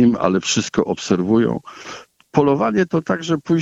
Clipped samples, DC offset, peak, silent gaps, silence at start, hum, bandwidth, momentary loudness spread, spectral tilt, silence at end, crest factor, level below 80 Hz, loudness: under 0.1%; under 0.1%; 0 dBFS; none; 0 s; none; 8.2 kHz; 17 LU; -5.5 dB/octave; 0 s; 18 dB; -52 dBFS; -18 LUFS